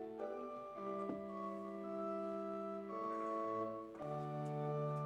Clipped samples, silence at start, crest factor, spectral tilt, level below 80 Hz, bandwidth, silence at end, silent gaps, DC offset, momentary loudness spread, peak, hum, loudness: under 0.1%; 0 s; 14 dB; -9 dB/octave; -78 dBFS; 10 kHz; 0 s; none; under 0.1%; 5 LU; -30 dBFS; none; -44 LUFS